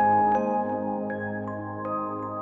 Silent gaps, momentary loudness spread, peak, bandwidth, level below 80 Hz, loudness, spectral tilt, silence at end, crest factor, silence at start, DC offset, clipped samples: none; 11 LU; -12 dBFS; 6.4 kHz; -66 dBFS; -27 LUFS; -9.5 dB/octave; 0 s; 14 dB; 0 s; under 0.1%; under 0.1%